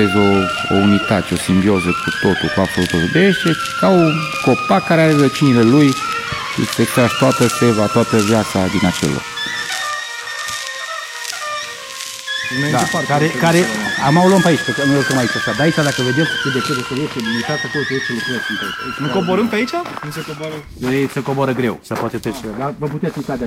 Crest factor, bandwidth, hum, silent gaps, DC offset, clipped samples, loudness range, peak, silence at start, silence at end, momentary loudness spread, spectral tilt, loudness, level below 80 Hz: 16 dB; 16 kHz; none; none; under 0.1%; under 0.1%; 7 LU; 0 dBFS; 0 s; 0 s; 11 LU; -5 dB/octave; -16 LUFS; -46 dBFS